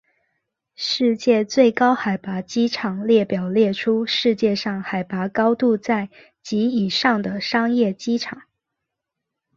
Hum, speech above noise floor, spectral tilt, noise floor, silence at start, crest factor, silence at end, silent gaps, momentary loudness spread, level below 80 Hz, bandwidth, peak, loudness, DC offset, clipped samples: none; 62 dB; -5.5 dB/octave; -82 dBFS; 0.8 s; 18 dB; 1.2 s; none; 8 LU; -64 dBFS; 7.4 kHz; -2 dBFS; -20 LUFS; under 0.1%; under 0.1%